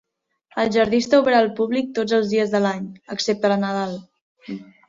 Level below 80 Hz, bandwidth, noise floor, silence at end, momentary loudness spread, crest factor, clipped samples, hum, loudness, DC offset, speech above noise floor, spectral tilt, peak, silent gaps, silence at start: -60 dBFS; 7.8 kHz; -60 dBFS; 0.25 s; 15 LU; 16 dB; under 0.1%; none; -20 LUFS; under 0.1%; 40 dB; -5 dB/octave; -4 dBFS; 4.21-4.36 s; 0.55 s